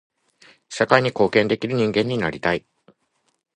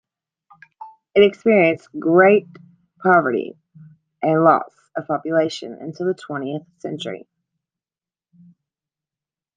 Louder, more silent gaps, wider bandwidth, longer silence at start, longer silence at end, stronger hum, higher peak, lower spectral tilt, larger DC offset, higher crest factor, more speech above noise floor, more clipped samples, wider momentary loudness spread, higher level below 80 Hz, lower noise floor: about the same, -20 LUFS vs -18 LUFS; neither; first, 10.5 kHz vs 9.2 kHz; about the same, 0.7 s vs 0.8 s; second, 0.95 s vs 2.4 s; neither; about the same, 0 dBFS vs -2 dBFS; about the same, -5.5 dB/octave vs -6.5 dB/octave; neither; about the same, 22 dB vs 20 dB; second, 50 dB vs over 72 dB; neither; second, 7 LU vs 17 LU; first, -56 dBFS vs -66 dBFS; second, -70 dBFS vs under -90 dBFS